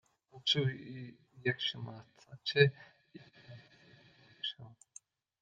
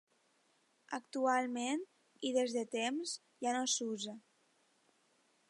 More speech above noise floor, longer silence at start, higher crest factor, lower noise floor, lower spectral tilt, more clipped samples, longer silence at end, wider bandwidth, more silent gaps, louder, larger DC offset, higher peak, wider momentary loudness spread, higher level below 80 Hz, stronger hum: second, 27 dB vs 38 dB; second, 0.35 s vs 0.9 s; first, 26 dB vs 20 dB; second, -62 dBFS vs -75 dBFS; first, -5 dB/octave vs -2 dB/octave; neither; second, 0.75 s vs 1.3 s; second, 9.4 kHz vs 11.5 kHz; neither; first, -34 LUFS vs -37 LUFS; neither; first, -12 dBFS vs -20 dBFS; first, 27 LU vs 12 LU; first, -80 dBFS vs under -90 dBFS; neither